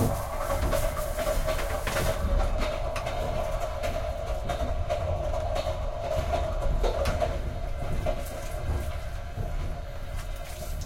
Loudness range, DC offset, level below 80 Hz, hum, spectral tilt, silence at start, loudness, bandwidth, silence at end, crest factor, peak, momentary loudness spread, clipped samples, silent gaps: 3 LU; under 0.1%; -32 dBFS; none; -5.5 dB/octave; 0 s; -31 LUFS; 16.5 kHz; 0 s; 16 dB; -12 dBFS; 8 LU; under 0.1%; none